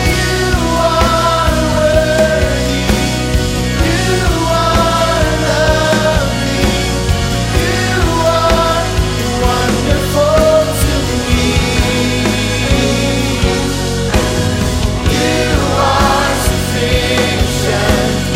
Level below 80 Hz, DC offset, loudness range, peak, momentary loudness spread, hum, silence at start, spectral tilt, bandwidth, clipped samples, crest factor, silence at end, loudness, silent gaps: -20 dBFS; under 0.1%; 1 LU; 0 dBFS; 4 LU; none; 0 s; -4.5 dB/octave; 16 kHz; under 0.1%; 12 dB; 0 s; -13 LUFS; none